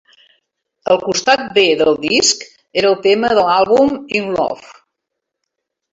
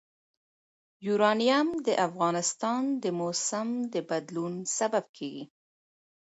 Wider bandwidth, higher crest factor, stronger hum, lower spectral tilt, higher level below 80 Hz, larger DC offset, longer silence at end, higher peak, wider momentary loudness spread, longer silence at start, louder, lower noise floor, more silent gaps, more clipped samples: about the same, 8 kHz vs 8.4 kHz; about the same, 16 dB vs 20 dB; neither; about the same, -2.5 dB/octave vs -3.5 dB/octave; first, -54 dBFS vs -78 dBFS; neither; first, 1.2 s vs 0.75 s; first, 0 dBFS vs -10 dBFS; second, 10 LU vs 14 LU; second, 0.85 s vs 1 s; first, -14 LUFS vs -28 LUFS; second, -78 dBFS vs under -90 dBFS; second, none vs 5.09-5.14 s; neither